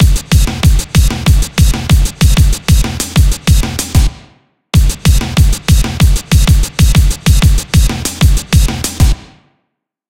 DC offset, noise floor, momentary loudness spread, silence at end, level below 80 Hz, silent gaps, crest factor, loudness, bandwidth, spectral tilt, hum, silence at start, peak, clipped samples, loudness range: 0.4%; -70 dBFS; 3 LU; 0.9 s; -12 dBFS; none; 10 dB; -11 LUFS; 16.5 kHz; -4.5 dB/octave; none; 0 s; 0 dBFS; 0.2%; 2 LU